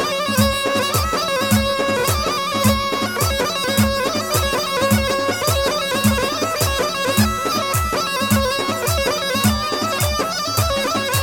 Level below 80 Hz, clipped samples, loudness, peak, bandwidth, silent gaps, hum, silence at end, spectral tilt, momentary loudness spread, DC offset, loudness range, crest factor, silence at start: -32 dBFS; under 0.1%; -18 LUFS; -2 dBFS; 17.5 kHz; none; none; 0 s; -4 dB/octave; 2 LU; under 0.1%; 1 LU; 18 dB; 0 s